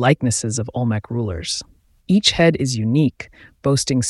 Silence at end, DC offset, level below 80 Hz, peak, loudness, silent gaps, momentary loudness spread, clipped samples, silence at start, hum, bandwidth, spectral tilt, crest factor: 0 s; under 0.1%; -44 dBFS; -2 dBFS; -19 LUFS; none; 10 LU; under 0.1%; 0 s; none; 12 kHz; -4.5 dB/octave; 18 dB